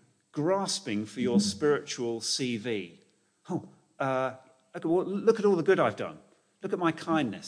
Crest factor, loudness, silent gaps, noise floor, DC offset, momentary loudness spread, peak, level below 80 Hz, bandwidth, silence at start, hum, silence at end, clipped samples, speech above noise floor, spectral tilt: 18 dB; -29 LUFS; none; -64 dBFS; under 0.1%; 12 LU; -12 dBFS; -74 dBFS; 10.5 kHz; 0.35 s; none; 0 s; under 0.1%; 35 dB; -4.5 dB/octave